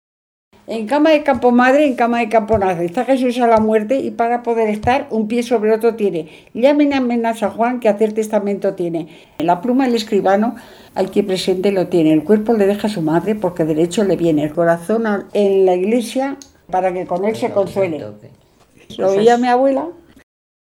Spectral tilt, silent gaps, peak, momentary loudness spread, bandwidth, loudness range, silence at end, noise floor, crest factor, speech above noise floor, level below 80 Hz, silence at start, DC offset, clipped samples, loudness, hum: -6 dB/octave; none; 0 dBFS; 9 LU; 16.5 kHz; 3 LU; 0.8 s; -50 dBFS; 16 dB; 34 dB; -50 dBFS; 0.7 s; under 0.1%; under 0.1%; -16 LUFS; none